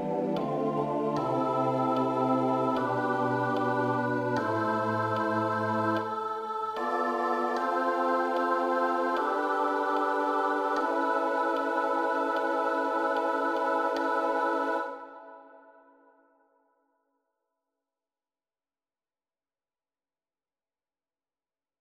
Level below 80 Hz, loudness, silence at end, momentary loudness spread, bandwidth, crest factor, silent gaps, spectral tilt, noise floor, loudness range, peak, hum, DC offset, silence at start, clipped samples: -74 dBFS; -28 LUFS; 6.2 s; 3 LU; 15.5 kHz; 16 dB; none; -6.5 dB/octave; under -90 dBFS; 3 LU; -14 dBFS; none; under 0.1%; 0 s; under 0.1%